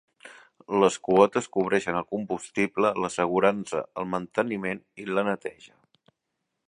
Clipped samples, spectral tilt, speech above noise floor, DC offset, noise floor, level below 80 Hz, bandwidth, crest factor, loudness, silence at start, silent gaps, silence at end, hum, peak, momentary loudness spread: under 0.1%; -5 dB/octave; 56 dB; under 0.1%; -81 dBFS; -64 dBFS; 11 kHz; 24 dB; -26 LUFS; 0.25 s; none; 1.05 s; none; -4 dBFS; 10 LU